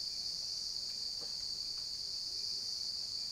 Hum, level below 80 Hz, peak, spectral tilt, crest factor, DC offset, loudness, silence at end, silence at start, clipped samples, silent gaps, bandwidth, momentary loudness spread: none; -68 dBFS; -26 dBFS; 0.5 dB/octave; 14 dB; under 0.1%; -37 LUFS; 0 s; 0 s; under 0.1%; none; 16 kHz; 1 LU